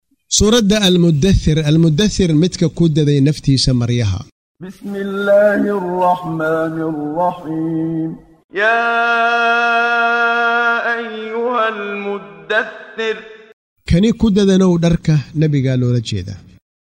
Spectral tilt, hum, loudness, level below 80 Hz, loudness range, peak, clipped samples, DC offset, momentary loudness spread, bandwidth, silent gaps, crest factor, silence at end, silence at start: -5.5 dB/octave; none; -15 LUFS; -34 dBFS; 5 LU; -2 dBFS; under 0.1%; under 0.1%; 12 LU; 15.5 kHz; 4.32-4.55 s, 8.44-8.49 s, 13.53-13.76 s; 12 dB; 0.4 s; 0.3 s